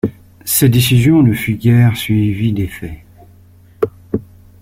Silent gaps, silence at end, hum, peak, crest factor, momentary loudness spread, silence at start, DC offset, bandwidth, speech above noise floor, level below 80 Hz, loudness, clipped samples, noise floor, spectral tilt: none; 0.4 s; none; 0 dBFS; 14 dB; 14 LU; 0.05 s; under 0.1%; 16.5 kHz; 32 dB; -40 dBFS; -14 LUFS; under 0.1%; -44 dBFS; -6 dB/octave